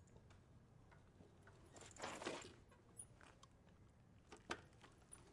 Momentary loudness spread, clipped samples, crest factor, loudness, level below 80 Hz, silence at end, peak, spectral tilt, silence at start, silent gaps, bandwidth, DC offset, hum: 18 LU; under 0.1%; 28 dB; -57 LUFS; -76 dBFS; 0 s; -32 dBFS; -3 dB/octave; 0 s; none; 12 kHz; under 0.1%; none